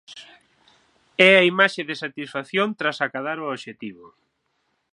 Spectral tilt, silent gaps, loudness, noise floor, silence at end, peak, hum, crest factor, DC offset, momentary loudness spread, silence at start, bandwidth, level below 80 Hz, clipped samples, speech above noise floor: -4.5 dB/octave; none; -20 LUFS; -72 dBFS; 0.85 s; 0 dBFS; none; 24 dB; under 0.1%; 19 LU; 0.1 s; 11 kHz; -74 dBFS; under 0.1%; 50 dB